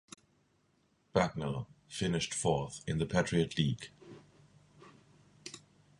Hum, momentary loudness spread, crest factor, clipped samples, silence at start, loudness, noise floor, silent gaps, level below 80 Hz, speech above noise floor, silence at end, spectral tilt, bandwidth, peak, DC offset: none; 22 LU; 24 dB; under 0.1%; 1.15 s; -34 LUFS; -73 dBFS; none; -58 dBFS; 40 dB; 0.4 s; -5 dB/octave; 11.5 kHz; -12 dBFS; under 0.1%